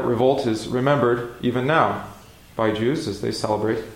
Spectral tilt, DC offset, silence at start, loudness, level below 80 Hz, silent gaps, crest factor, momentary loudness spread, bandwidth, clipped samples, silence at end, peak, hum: -6 dB/octave; under 0.1%; 0 s; -22 LUFS; -52 dBFS; none; 18 dB; 7 LU; 16.5 kHz; under 0.1%; 0 s; -4 dBFS; none